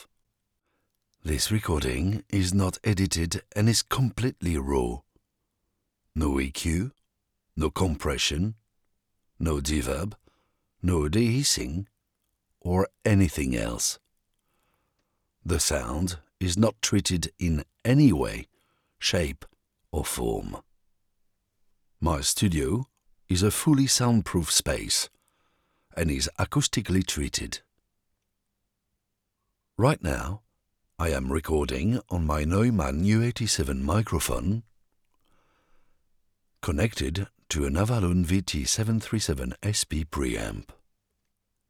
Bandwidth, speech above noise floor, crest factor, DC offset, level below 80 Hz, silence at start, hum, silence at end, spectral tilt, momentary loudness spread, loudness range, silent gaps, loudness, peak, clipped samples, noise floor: 18.5 kHz; 55 dB; 20 dB; under 0.1%; -40 dBFS; 0 s; none; 1.1 s; -4.5 dB/octave; 10 LU; 7 LU; none; -26 LUFS; -8 dBFS; under 0.1%; -80 dBFS